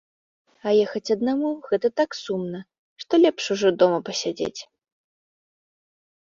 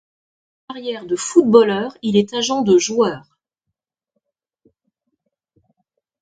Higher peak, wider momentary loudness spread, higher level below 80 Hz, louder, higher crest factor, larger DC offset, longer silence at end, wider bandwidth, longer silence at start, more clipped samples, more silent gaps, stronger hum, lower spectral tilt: second, -4 dBFS vs 0 dBFS; second, 13 LU vs 16 LU; second, -68 dBFS vs -62 dBFS; second, -23 LUFS vs -17 LUFS; about the same, 20 dB vs 20 dB; neither; second, 1.7 s vs 3 s; second, 7.6 kHz vs 9.4 kHz; about the same, 0.65 s vs 0.7 s; neither; first, 2.79-2.96 s vs none; neither; about the same, -4.5 dB/octave vs -4.5 dB/octave